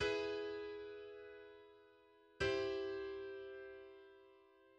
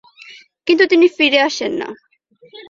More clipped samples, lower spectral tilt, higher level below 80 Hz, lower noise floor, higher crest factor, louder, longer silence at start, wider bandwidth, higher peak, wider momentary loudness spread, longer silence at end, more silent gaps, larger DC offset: neither; first, -4.5 dB/octave vs -2.5 dB/octave; about the same, -68 dBFS vs -64 dBFS; first, -68 dBFS vs -49 dBFS; about the same, 20 dB vs 16 dB; second, -44 LUFS vs -14 LUFS; second, 0 s vs 0.3 s; first, 9.2 kHz vs 7.4 kHz; second, -26 dBFS vs 0 dBFS; first, 23 LU vs 14 LU; about the same, 0.05 s vs 0.1 s; neither; neither